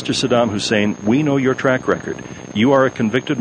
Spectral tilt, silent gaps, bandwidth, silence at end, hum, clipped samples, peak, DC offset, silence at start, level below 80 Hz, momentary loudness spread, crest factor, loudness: -5.5 dB/octave; none; 10 kHz; 0 s; none; under 0.1%; -2 dBFS; under 0.1%; 0 s; -50 dBFS; 8 LU; 14 dB; -17 LUFS